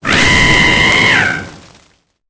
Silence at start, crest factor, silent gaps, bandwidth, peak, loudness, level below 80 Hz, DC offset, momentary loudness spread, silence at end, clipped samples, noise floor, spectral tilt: 0.05 s; 12 dB; none; 8 kHz; 0 dBFS; -8 LUFS; -28 dBFS; under 0.1%; 7 LU; 0.7 s; under 0.1%; -53 dBFS; -3 dB/octave